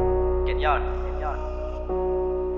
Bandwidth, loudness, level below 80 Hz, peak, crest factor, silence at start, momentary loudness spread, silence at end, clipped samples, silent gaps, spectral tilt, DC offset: 5.6 kHz; -26 LUFS; -30 dBFS; -8 dBFS; 16 dB; 0 s; 8 LU; 0 s; under 0.1%; none; -9 dB/octave; under 0.1%